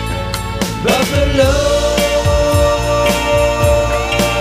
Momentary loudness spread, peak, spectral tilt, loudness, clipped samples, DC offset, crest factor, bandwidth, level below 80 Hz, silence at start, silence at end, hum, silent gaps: 7 LU; 0 dBFS; -4.5 dB/octave; -14 LUFS; under 0.1%; under 0.1%; 12 dB; 15.5 kHz; -22 dBFS; 0 s; 0 s; none; none